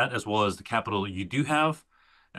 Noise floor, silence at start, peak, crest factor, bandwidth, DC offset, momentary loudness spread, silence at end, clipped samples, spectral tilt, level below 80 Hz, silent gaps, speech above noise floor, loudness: -57 dBFS; 0 s; -10 dBFS; 18 dB; 12.5 kHz; under 0.1%; 6 LU; 0 s; under 0.1%; -5 dB/octave; -62 dBFS; none; 29 dB; -27 LUFS